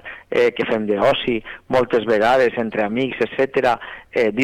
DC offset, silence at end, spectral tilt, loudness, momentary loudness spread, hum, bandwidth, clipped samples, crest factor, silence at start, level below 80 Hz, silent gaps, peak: under 0.1%; 0 s; -6 dB/octave; -19 LUFS; 7 LU; none; 12 kHz; under 0.1%; 10 dB; 0.05 s; -50 dBFS; none; -8 dBFS